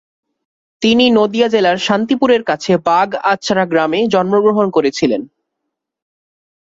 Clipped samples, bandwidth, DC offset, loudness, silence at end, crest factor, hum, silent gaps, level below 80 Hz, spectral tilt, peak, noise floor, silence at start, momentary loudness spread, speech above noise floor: under 0.1%; 7.8 kHz; under 0.1%; -14 LUFS; 1.4 s; 14 dB; none; none; -56 dBFS; -5 dB/octave; -2 dBFS; -76 dBFS; 0.8 s; 4 LU; 63 dB